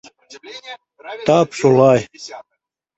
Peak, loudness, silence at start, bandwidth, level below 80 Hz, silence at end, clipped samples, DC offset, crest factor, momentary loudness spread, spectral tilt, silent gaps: -2 dBFS; -15 LUFS; 0.45 s; 8.2 kHz; -56 dBFS; 0.55 s; under 0.1%; under 0.1%; 16 dB; 23 LU; -6 dB/octave; none